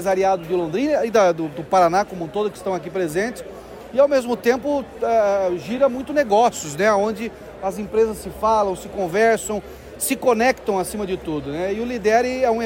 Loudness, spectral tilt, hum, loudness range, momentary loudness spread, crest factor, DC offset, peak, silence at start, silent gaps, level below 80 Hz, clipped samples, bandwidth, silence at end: -20 LUFS; -4.5 dB/octave; none; 2 LU; 9 LU; 16 dB; under 0.1%; -4 dBFS; 0 s; none; -48 dBFS; under 0.1%; 16.5 kHz; 0 s